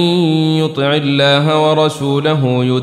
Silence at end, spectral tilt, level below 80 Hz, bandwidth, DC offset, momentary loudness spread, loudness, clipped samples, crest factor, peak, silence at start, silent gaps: 0 s; -6.5 dB/octave; -58 dBFS; 12.5 kHz; under 0.1%; 4 LU; -13 LUFS; under 0.1%; 12 dB; -2 dBFS; 0 s; none